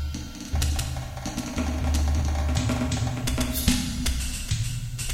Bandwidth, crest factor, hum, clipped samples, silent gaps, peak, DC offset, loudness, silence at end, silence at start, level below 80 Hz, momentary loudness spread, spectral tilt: 16.5 kHz; 20 dB; none; under 0.1%; none; -6 dBFS; under 0.1%; -27 LUFS; 0 s; 0 s; -30 dBFS; 8 LU; -4.5 dB/octave